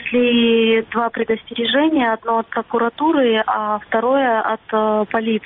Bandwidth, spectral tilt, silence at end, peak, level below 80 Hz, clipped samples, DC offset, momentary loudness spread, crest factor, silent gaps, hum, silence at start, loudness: 4 kHz; -2 dB/octave; 0.05 s; -6 dBFS; -58 dBFS; under 0.1%; under 0.1%; 6 LU; 12 dB; none; none; 0 s; -17 LUFS